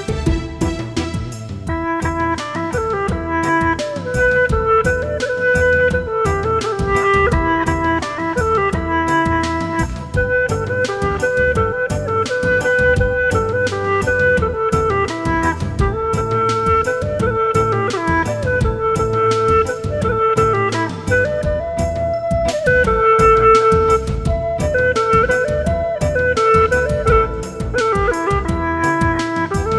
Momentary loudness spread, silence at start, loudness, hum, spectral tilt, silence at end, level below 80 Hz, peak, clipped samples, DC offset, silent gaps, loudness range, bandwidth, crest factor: 7 LU; 0 s; -17 LUFS; none; -6 dB/octave; 0 s; -28 dBFS; 0 dBFS; under 0.1%; 0.2%; none; 4 LU; 11 kHz; 16 dB